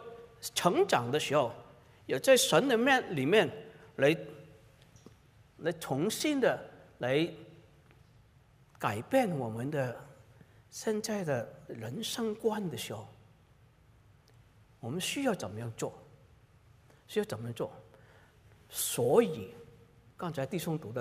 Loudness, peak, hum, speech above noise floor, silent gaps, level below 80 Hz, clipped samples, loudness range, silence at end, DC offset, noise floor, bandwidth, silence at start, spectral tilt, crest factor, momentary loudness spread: -32 LUFS; -10 dBFS; none; 31 dB; none; -70 dBFS; under 0.1%; 11 LU; 0 s; under 0.1%; -62 dBFS; 16 kHz; 0 s; -4 dB/octave; 22 dB; 18 LU